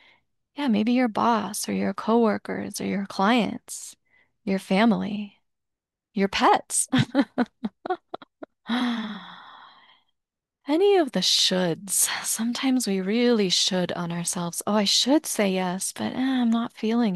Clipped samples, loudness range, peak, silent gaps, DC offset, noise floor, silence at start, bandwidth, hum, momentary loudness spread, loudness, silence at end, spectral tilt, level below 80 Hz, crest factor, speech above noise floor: under 0.1%; 5 LU; -8 dBFS; none; under 0.1%; -85 dBFS; 0.55 s; 13 kHz; none; 15 LU; -23 LUFS; 0 s; -3.5 dB/octave; -64 dBFS; 18 dB; 62 dB